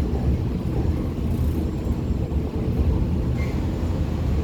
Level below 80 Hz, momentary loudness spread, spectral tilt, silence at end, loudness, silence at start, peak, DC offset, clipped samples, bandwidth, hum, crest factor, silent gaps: -28 dBFS; 3 LU; -8.5 dB/octave; 0 s; -25 LUFS; 0 s; -10 dBFS; under 0.1%; under 0.1%; 15 kHz; none; 14 dB; none